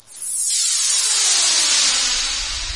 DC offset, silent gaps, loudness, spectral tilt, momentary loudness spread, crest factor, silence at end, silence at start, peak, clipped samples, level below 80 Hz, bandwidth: 0.2%; none; -15 LUFS; 2.5 dB/octave; 7 LU; 14 dB; 0 s; 0.1 s; -4 dBFS; under 0.1%; -40 dBFS; 11.5 kHz